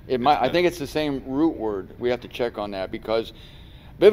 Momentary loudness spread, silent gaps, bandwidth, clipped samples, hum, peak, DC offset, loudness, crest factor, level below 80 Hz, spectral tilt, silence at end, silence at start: 10 LU; none; 16 kHz; under 0.1%; none; -2 dBFS; under 0.1%; -24 LUFS; 20 dB; -46 dBFS; -6 dB/octave; 0 s; 0.05 s